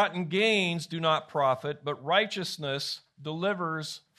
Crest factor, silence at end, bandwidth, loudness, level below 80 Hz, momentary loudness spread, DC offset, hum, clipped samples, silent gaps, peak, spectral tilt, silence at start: 20 dB; 0.2 s; 13.5 kHz; -29 LUFS; -76 dBFS; 10 LU; under 0.1%; none; under 0.1%; none; -8 dBFS; -4.5 dB/octave; 0 s